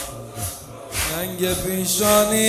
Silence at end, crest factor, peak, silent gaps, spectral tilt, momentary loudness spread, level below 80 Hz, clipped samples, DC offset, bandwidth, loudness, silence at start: 0 s; 20 dB; -2 dBFS; none; -3 dB/octave; 14 LU; -40 dBFS; under 0.1%; under 0.1%; 16 kHz; -21 LUFS; 0 s